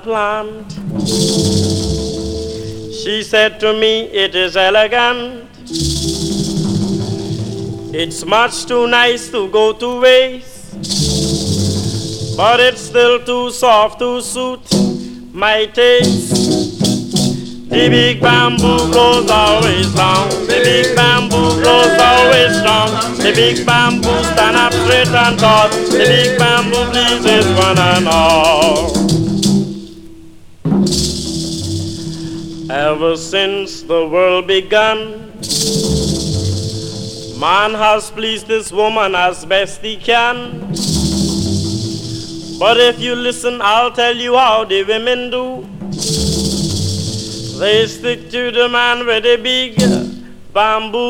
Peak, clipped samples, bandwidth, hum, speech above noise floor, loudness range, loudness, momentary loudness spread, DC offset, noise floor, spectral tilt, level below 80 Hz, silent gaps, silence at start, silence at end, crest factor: 0 dBFS; under 0.1%; 17.5 kHz; none; 23 dB; 7 LU; -13 LUFS; 12 LU; under 0.1%; -35 dBFS; -4 dB/octave; -34 dBFS; none; 0.05 s; 0 s; 14 dB